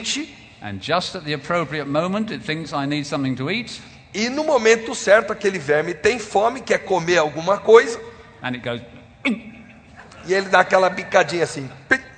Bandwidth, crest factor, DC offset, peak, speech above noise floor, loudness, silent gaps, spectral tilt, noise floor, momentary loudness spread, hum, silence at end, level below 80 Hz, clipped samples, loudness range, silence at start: 9.4 kHz; 20 dB; under 0.1%; 0 dBFS; 24 dB; -20 LUFS; none; -4 dB/octave; -44 dBFS; 15 LU; none; 0.05 s; -56 dBFS; under 0.1%; 5 LU; 0 s